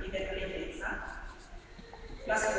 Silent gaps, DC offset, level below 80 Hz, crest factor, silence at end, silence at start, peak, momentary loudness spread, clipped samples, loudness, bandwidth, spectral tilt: none; under 0.1%; -46 dBFS; 18 dB; 0 s; 0 s; -18 dBFS; 18 LU; under 0.1%; -37 LUFS; 8 kHz; -3.5 dB/octave